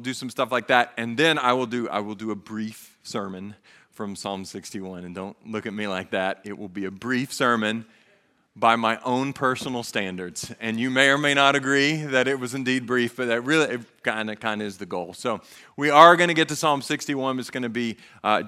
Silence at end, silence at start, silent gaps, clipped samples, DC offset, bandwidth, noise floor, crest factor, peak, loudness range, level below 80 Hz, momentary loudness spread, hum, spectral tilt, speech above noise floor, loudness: 0 s; 0 s; none; under 0.1%; under 0.1%; 15.5 kHz; -62 dBFS; 24 dB; 0 dBFS; 12 LU; -70 dBFS; 16 LU; none; -4 dB/octave; 39 dB; -23 LUFS